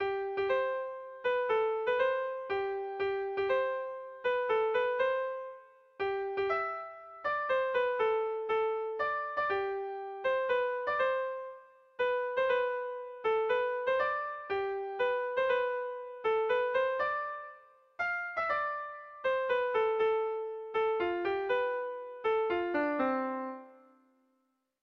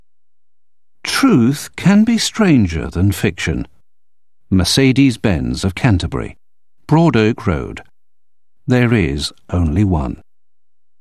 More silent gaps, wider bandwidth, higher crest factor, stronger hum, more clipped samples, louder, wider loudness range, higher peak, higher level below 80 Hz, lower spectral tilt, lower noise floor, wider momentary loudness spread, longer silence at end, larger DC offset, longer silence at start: neither; second, 6.2 kHz vs 14 kHz; about the same, 14 dB vs 16 dB; neither; neither; second, -32 LUFS vs -15 LUFS; about the same, 1 LU vs 3 LU; second, -18 dBFS vs 0 dBFS; second, -70 dBFS vs -32 dBFS; about the same, -5.5 dB/octave vs -5.5 dB/octave; second, -78 dBFS vs -87 dBFS; second, 8 LU vs 13 LU; first, 1.05 s vs 0.85 s; second, under 0.1% vs 0.7%; second, 0 s vs 1.05 s